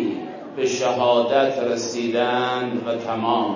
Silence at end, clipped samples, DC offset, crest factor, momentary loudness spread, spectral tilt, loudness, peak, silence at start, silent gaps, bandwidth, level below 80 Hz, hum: 0 s; under 0.1%; under 0.1%; 16 dB; 7 LU; -4 dB/octave; -22 LUFS; -4 dBFS; 0 s; none; 7.4 kHz; -68 dBFS; none